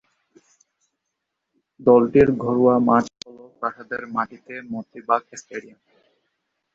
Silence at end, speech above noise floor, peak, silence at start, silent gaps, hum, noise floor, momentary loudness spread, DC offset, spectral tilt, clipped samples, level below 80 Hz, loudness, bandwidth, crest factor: 1.15 s; 60 dB; -4 dBFS; 1.8 s; none; none; -80 dBFS; 20 LU; under 0.1%; -7 dB/octave; under 0.1%; -52 dBFS; -20 LUFS; 7.8 kHz; 20 dB